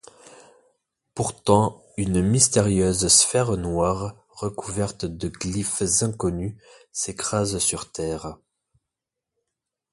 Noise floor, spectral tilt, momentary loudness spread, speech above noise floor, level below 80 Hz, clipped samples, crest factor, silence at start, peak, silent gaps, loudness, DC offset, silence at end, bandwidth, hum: -86 dBFS; -4 dB/octave; 15 LU; 63 dB; -44 dBFS; under 0.1%; 22 dB; 0.4 s; -2 dBFS; none; -22 LUFS; under 0.1%; 1.55 s; 12 kHz; none